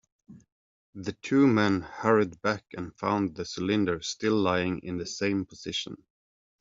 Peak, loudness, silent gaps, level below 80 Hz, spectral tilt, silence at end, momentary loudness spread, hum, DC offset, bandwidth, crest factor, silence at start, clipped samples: -8 dBFS; -28 LUFS; 0.52-0.93 s; -64 dBFS; -4.5 dB/octave; 0.65 s; 13 LU; none; under 0.1%; 7.8 kHz; 22 dB; 0.3 s; under 0.1%